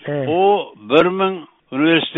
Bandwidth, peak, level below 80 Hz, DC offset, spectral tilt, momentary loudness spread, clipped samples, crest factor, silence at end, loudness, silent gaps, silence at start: 4.3 kHz; 0 dBFS; -58 dBFS; under 0.1%; -3.5 dB/octave; 9 LU; under 0.1%; 16 dB; 0 s; -17 LUFS; none; 0.05 s